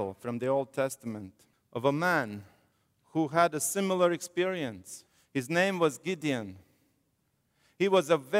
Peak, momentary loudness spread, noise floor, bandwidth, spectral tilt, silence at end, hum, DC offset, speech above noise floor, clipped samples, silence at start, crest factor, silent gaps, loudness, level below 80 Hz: -10 dBFS; 17 LU; -75 dBFS; 16 kHz; -4.5 dB/octave; 0 s; none; under 0.1%; 46 dB; under 0.1%; 0 s; 20 dB; none; -30 LUFS; -76 dBFS